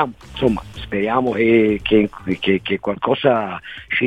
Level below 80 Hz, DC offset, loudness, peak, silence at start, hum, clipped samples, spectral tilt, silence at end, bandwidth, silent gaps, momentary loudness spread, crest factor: -42 dBFS; 0.2%; -19 LUFS; -2 dBFS; 0 s; none; under 0.1%; -7.5 dB/octave; 0 s; 9.4 kHz; none; 10 LU; 18 dB